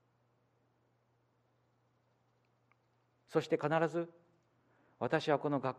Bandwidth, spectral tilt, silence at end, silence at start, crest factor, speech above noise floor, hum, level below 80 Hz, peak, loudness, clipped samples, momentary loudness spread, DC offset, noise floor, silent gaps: 10.5 kHz; -6.5 dB/octave; 0 s; 3.3 s; 22 dB; 41 dB; none; -84 dBFS; -18 dBFS; -35 LUFS; under 0.1%; 9 LU; under 0.1%; -76 dBFS; none